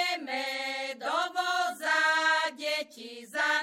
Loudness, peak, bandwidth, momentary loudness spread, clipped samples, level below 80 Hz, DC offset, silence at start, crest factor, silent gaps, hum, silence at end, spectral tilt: -29 LUFS; -14 dBFS; 16.5 kHz; 9 LU; under 0.1%; under -90 dBFS; under 0.1%; 0 s; 16 dB; none; none; 0 s; 0.5 dB/octave